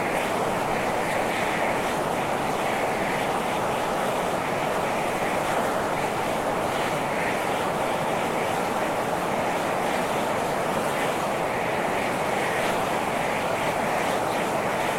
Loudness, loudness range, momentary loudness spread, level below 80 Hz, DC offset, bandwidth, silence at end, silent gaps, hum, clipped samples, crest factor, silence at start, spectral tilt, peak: -25 LUFS; 0 LU; 1 LU; -52 dBFS; under 0.1%; 16.5 kHz; 0 s; none; none; under 0.1%; 14 dB; 0 s; -4 dB/octave; -12 dBFS